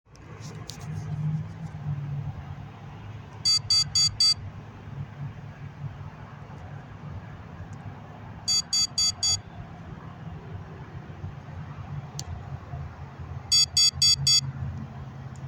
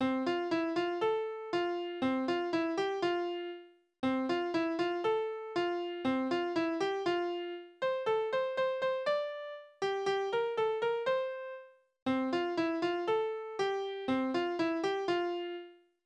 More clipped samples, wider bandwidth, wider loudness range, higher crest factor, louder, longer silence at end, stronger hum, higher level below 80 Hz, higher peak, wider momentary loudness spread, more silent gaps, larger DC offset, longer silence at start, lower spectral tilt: neither; first, 17 kHz vs 8.8 kHz; first, 16 LU vs 1 LU; first, 20 dB vs 14 dB; first, -23 LUFS vs -34 LUFS; second, 0 s vs 0.3 s; neither; first, -52 dBFS vs -76 dBFS; first, -10 dBFS vs -20 dBFS; first, 23 LU vs 7 LU; second, none vs 12.02-12.06 s; neither; about the same, 0.1 s vs 0 s; second, -1.5 dB/octave vs -5 dB/octave